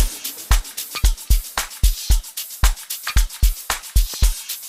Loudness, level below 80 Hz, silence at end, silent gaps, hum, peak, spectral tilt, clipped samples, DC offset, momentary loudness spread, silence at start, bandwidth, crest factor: -22 LUFS; -20 dBFS; 0 s; none; none; -2 dBFS; -2.5 dB/octave; under 0.1%; under 0.1%; 5 LU; 0 s; 16 kHz; 16 dB